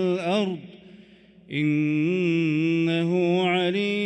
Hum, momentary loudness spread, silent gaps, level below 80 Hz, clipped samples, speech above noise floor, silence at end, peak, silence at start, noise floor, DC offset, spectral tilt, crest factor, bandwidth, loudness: none; 5 LU; none; -70 dBFS; under 0.1%; 28 dB; 0 s; -12 dBFS; 0 s; -51 dBFS; under 0.1%; -7 dB/octave; 12 dB; 9 kHz; -23 LUFS